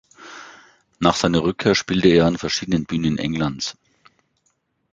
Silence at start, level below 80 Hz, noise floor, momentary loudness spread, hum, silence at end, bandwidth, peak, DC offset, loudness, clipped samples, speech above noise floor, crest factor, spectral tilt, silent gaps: 0.2 s; -46 dBFS; -68 dBFS; 20 LU; none; 1.2 s; 9.2 kHz; -2 dBFS; under 0.1%; -20 LUFS; under 0.1%; 49 dB; 20 dB; -5 dB/octave; none